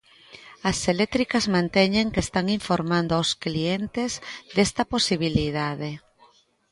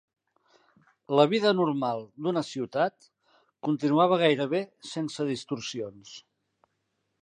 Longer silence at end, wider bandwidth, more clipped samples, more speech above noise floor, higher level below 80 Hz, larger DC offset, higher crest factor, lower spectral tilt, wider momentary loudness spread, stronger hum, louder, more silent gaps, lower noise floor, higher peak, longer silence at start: second, 0.75 s vs 1.05 s; first, 11.5 kHz vs 9.8 kHz; neither; second, 34 dB vs 51 dB; first, -46 dBFS vs -78 dBFS; neither; about the same, 20 dB vs 22 dB; about the same, -4.5 dB/octave vs -5.5 dB/octave; second, 8 LU vs 15 LU; neither; first, -24 LUFS vs -27 LUFS; neither; second, -58 dBFS vs -78 dBFS; about the same, -6 dBFS vs -8 dBFS; second, 0.3 s vs 1.1 s